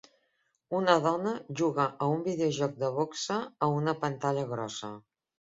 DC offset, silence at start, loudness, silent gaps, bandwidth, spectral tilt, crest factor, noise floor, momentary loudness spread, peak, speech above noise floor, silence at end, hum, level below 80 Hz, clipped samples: under 0.1%; 0.7 s; -30 LUFS; none; 7.8 kHz; -5.5 dB/octave; 24 dB; -76 dBFS; 10 LU; -8 dBFS; 46 dB; 0.6 s; none; -72 dBFS; under 0.1%